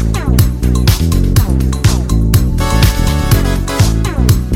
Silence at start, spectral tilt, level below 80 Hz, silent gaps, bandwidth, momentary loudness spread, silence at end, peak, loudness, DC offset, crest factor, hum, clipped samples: 0 s; -5.5 dB/octave; -14 dBFS; none; 17 kHz; 2 LU; 0 s; 0 dBFS; -13 LUFS; under 0.1%; 10 dB; none; under 0.1%